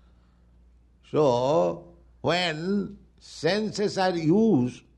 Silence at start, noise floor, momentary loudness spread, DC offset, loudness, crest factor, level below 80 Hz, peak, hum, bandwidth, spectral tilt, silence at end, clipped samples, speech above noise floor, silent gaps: 1.15 s; -57 dBFS; 9 LU; under 0.1%; -25 LUFS; 16 dB; -58 dBFS; -10 dBFS; none; 11 kHz; -6 dB/octave; 0.2 s; under 0.1%; 33 dB; none